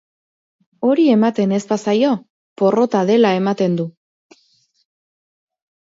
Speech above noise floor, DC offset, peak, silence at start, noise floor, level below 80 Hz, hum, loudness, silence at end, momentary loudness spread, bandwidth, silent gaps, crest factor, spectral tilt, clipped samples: 45 dB; under 0.1%; -4 dBFS; 0.8 s; -60 dBFS; -68 dBFS; none; -16 LUFS; 2 s; 7 LU; 7.8 kHz; 2.30-2.56 s; 16 dB; -7 dB/octave; under 0.1%